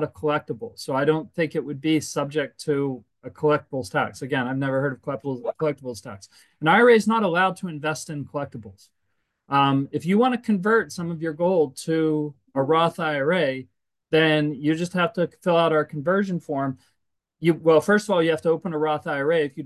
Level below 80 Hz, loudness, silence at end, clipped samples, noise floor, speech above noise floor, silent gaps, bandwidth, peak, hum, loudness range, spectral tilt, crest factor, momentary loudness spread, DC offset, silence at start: -64 dBFS; -23 LUFS; 0 s; under 0.1%; -76 dBFS; 53 dB; none; 12.5 kHz; -4 dBFS; none; 4 LU; -6 dB/octave; 18 dB; 11 LU; under 0.1%; 0 s